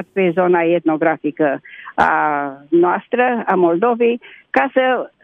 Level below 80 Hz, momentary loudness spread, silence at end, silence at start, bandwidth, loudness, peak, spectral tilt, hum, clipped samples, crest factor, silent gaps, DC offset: -58 dBFS; 5 LU; 0.15 s; 0 s; 4.8 kHz; -16 LUFS; 0 dBFS; -8 dB/octave; none; under 0.1%; 16 dB; none; under 0.1%